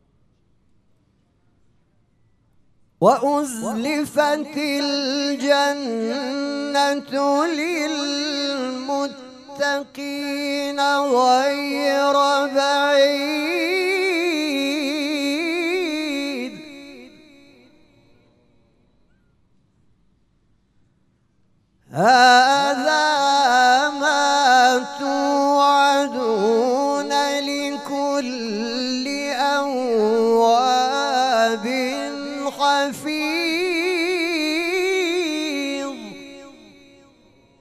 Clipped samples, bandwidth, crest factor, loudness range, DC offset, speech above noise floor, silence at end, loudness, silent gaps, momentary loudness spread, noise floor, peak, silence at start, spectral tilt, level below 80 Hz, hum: under 0.1%; 15 kHz; 20 dB; 8 LU; under 0.1%; 44 dB; 1.1 s; -19 LUFS; none; 10 LU; -63 dBFS; -2 dBFS; 3 s; -3 dB/octave; -68 dBFS; none